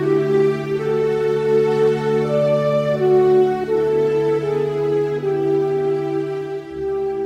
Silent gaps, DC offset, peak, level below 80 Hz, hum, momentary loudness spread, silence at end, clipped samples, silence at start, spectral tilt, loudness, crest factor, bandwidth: none; under 0.1%; -6 dBFS; -54 dBFS; none; 7 LU; 0 s; under 0.1%; 0 s; -8 dB/octave; -18 LUFS; 12 dB; 9.4 kHz